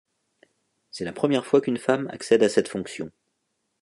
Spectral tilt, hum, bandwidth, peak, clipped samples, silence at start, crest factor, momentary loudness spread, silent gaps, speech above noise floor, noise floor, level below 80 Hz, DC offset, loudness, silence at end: -5 dB/octave; none; 11.5 kHz; -4 dBFS; under 0.1%; 0.95 s; 20 dB; 16 LU; none; 53 dB; -76 dBFS; -66 dBFS; under 0.1%; -24 LUFS; 0.75 s